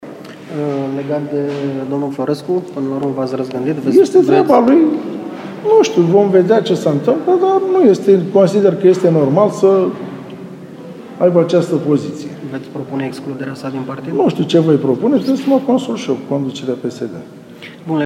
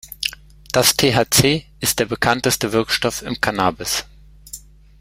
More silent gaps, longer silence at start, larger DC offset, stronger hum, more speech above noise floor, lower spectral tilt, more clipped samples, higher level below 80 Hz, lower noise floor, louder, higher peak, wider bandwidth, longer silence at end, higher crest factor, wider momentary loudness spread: neither; about the same, 0 s vs 0.05 s; neither; neither; about the same, 20 dB vs 22 dB; first, -7 dB/octave vs -3 dB/octave; neither; second, -64 dBFS vs -44 dBFS; second, -34 dBFS vs -40 dBFS; first, -14 LUFS vs -18 LUFS; about the same, 0 dBFS vs 0 dBFS; second, 12 kHz vs 16.5 kHz; second, 0 s vs 0.45 s; second, 14 dB vs 20 dB; first, 16 LU vs 11 LU